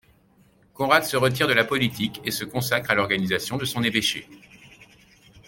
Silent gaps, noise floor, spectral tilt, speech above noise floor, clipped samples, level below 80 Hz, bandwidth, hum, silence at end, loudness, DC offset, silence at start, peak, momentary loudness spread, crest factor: none; -59 dBFS; -4 dB/octave; 35 dB; under 0.1%; -58 dBFS; 17 kHz; none; 0.1 s; -23 LUFS; under 0.1%; 0.8 s; -4 dBFS; 8 LU; 22 dB